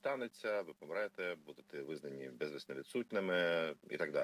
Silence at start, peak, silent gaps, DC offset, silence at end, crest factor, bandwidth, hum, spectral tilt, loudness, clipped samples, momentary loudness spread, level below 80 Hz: 0.05 s; -22 dBFS; none; under 0.1%; 0 s; 18 dB; 16 kHz; none; -5 dB/octave; -41 LUFS; under 0.1%; 12 LU; -86 dBFS